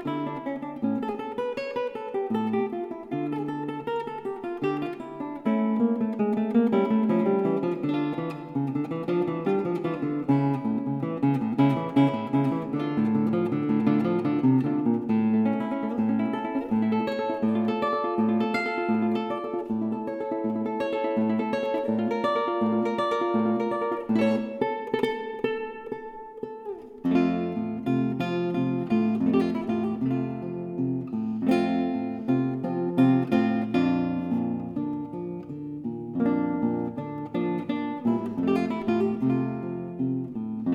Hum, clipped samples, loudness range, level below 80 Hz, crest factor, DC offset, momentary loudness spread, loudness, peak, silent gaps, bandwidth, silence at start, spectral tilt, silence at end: none; under 0.1%; 5 LU; -64 dBFS; 16 dB; under 0.1%; 9 LU; -27 LUFS; -10 dBFS; none; 8 kHz; 0 s; -8.5 dB/octave; 0 s